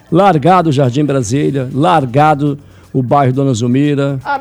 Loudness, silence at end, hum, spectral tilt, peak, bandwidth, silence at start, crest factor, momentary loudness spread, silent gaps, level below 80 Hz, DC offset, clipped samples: -12 LUFS; 0 s; none; -7 dB/octave; 0 dBFS; 11.5 kHz; 0.1 s; 12 dB; 7 LU; none; -48 dBFS; under 0.1%; 0.1%